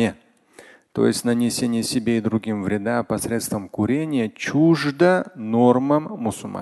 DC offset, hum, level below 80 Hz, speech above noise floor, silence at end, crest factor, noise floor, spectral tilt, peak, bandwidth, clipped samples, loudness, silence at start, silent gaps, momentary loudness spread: under 0.1%; none; -54 dBFS; 29 dB; 0 s; 20 dB; -50 dBFS; -5.5 dB/octave; -2 dBFS; 12.5 kHz; under 0.1%; -21 LUFS; 0 s; none; 7 LU